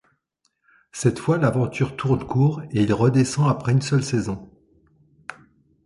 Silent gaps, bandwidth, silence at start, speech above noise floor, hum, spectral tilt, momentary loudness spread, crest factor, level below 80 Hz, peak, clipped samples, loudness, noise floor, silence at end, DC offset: none; 11.5 kHz; 0.95 s; 51 dB; none; -6.5 dB/octave; 20 LU; 18 dB; -50 dBFS; -4 dBFS; under 0.1%; -21 LUFS; -71 dBFS; 0.55 s; under 0.1%